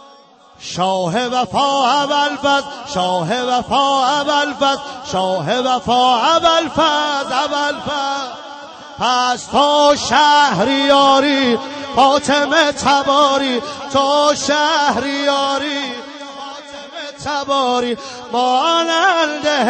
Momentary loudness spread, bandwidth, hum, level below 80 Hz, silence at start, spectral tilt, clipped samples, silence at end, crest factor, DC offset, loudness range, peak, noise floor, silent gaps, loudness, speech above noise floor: 13 LU; 9 kHz; none; -52 dBFS; 0.6 s; -3 dB/octave; under 0.1%; 0 s; 14 dB; under 0.1%; 6 LU; -2 dBFS; -45 dBFS; none; -15 LUFS; 30 dB